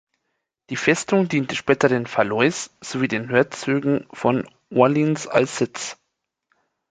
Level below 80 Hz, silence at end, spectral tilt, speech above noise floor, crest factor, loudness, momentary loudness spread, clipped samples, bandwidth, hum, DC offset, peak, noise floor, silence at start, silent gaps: -62 dBFS; 0.95 s; -5 dB/octave; 57 dB; 20 dB; -21 LUFS; 8 LU; under 0.1%; 9.6 kHz; none; under 0.1%; -2 dBFS; -77 dBFS; 0.7 s; none